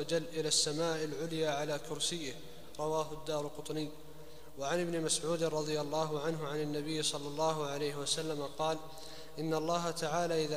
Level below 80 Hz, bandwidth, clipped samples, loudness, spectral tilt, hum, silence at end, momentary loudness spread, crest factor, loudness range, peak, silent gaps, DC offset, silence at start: -64 dBFS; 15.5 kHz; under 0.1%; -35 LUFS; -3.5 dB/octave; none; 0 s; 11 LU; 18 dB; 3 LU; -18 dBFS; none; 0.5%; 0 s